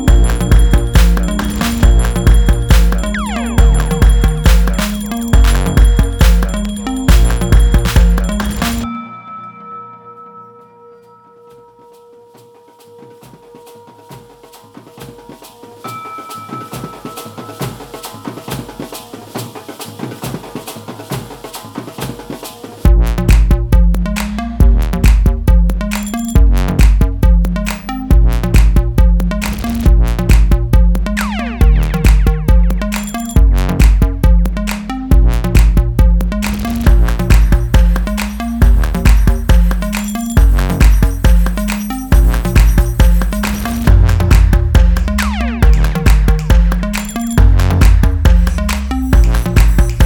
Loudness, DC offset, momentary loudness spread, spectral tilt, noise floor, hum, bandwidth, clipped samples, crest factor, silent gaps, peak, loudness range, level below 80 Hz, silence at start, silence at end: -13 LUFS; under 0.1%; 15 LU; -6 dB/octave; -42 dBFS; none; 18.5 kHz; under 0.1%; 10 dB; none; 0 dBFS; 14 LU; -12 dBFS; 0 s; 0 s